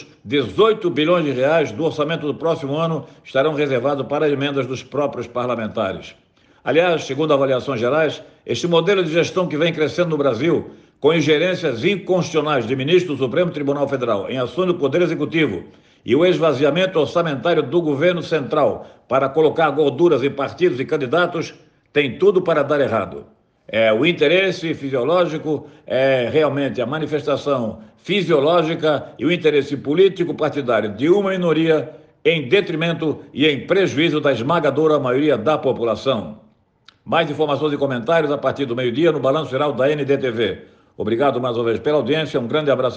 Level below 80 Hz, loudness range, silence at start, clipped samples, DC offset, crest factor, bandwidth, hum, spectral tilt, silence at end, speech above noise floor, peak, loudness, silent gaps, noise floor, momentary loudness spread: -62 dBFS; 3 LU; 0 s; under 0.1%; under 0.1%; 16 dB; 8.4 kHz; none; -6 dB/octave; 0 s; 36 dB; -4 dBFS; -19 LUFS; none; -54 dBFS; 7 LU